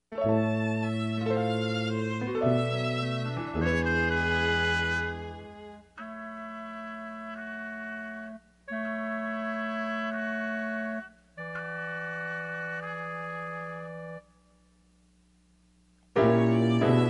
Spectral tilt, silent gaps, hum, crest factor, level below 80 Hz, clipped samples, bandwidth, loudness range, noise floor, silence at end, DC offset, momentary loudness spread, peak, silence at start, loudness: -7 dB/octave; none; 60 Hz at -65 dBFS; 20 dB; -50 dBFS; under 0.1%; 10.5 kHz; 11 LU; -63 dBFS; 0 s; under 0.1%; 15 LU; -10 dBFS; 0.1 s; -30 LUFS